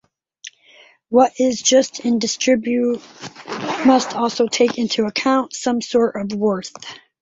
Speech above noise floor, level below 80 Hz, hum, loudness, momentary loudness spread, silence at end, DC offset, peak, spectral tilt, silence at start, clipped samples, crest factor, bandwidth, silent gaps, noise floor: 32 dB; -62 dBFS; none; -18 LUFS; 20 LU; 0.25 s; under 0.1%; -2 dBFS; -3.5 dB/octave; 0.45 s; under 0.1%; 18 dB; 8 kHz; none; -50 dBFS